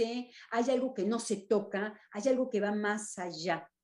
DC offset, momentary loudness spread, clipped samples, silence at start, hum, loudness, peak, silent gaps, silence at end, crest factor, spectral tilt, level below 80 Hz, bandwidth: under 0.1%; 7 LU; under 0.1%; 0 s; none; -33 LUFS; -16 dBFS; none; 0.15 s; 16 dB; -4.5 dB/octave; -80 dBFS; 12 kHz